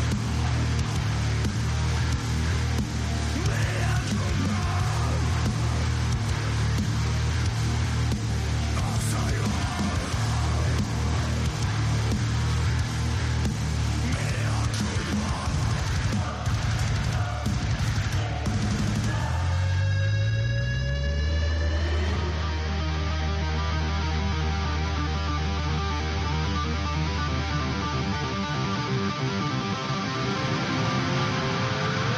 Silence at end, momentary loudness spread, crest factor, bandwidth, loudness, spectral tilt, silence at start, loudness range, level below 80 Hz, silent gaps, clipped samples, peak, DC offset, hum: 0 s; 2 LU; 12 dB; 13.5 kHz; -26 LUFS; -5.5 dB/octave; 0 s; 1 LU; -34 dBFS; none; under 0.1%; -14 dBFS; under 0.1%; none